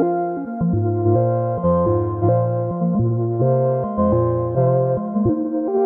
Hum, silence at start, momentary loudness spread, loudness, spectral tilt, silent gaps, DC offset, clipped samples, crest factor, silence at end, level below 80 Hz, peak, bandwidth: none; 0 s; 4 LU; -19 LUFS; -14.5 dB/octave; none; under 0.1%; under 0.1%; 12 dB; 0 s; -42 dBFS; -6 dBFS; 2.2 kHz